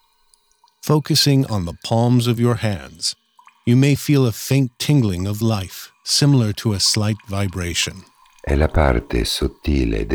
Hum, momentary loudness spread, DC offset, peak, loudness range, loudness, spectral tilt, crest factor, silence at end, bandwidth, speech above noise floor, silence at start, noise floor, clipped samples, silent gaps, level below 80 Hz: none; 9 LU; under 0.1%; -2 dBFS; 2 LU; -18 LUFS; -5 dB/octave; 16 dB; 0 s; over 20 kHz; 41 dB; 0.85 s; -59 dBFS; under 0.1%; none; -32 dBFS